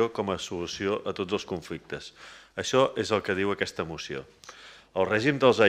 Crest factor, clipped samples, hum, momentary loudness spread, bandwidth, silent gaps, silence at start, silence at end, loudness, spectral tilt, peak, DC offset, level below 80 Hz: 22 dB; under 0.1%; none; 19 LU; 14 kHz; none; 0 s; 0 s; -28 LUFS; -4.5 dB/octave; -6 dBFS; under 0.1%; -62 dBFS